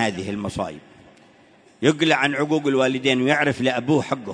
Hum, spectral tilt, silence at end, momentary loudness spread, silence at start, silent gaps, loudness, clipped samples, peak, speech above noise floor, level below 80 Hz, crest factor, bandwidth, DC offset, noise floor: none; -5 dB/octave; 0 s; 10 LU; 0 s; none; -21 LUFS; under 0.1%; -2 dBFS; 32 dB; -56 dBFS; 20 dB; 10.5 kHz; under 0.1%; -53 dBFS